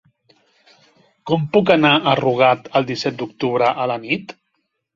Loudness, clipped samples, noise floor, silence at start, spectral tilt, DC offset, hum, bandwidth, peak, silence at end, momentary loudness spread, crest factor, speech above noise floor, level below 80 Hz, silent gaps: -17 LUFS; under 0.1%; -72 dBFS; 1.25 s; -6.5 dB/octave; under 0.1%; none; 7.4 kHz; 0 dBFS; 0.65 s; 10 LU; 18 dB; 54 dB; -60 dBFS; none